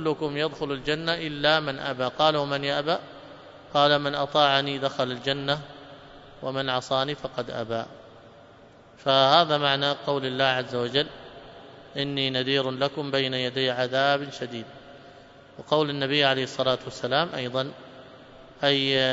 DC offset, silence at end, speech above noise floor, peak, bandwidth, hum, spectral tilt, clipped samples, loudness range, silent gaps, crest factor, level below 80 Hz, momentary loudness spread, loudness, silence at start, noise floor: under 0.1%; 0 s; 26 dB; -4 dBFS; 8 kHz; none; -5 dB/octave; under 0.1%; 5 LU; none; 24 dB; -60 dBFS; 15 LU; -25 LUFS; 0 s; -51 dBFS